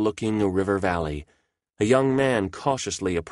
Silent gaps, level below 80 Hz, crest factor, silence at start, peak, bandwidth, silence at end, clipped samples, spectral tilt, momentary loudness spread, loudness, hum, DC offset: none; -48 dBFS; 18 dB; 0 s; -6 dBFS; 11.5 kHz; 0 s; under 0.1%; -5.5 dB/octave; 8 LU; -24 LUFS; none; under 0.1%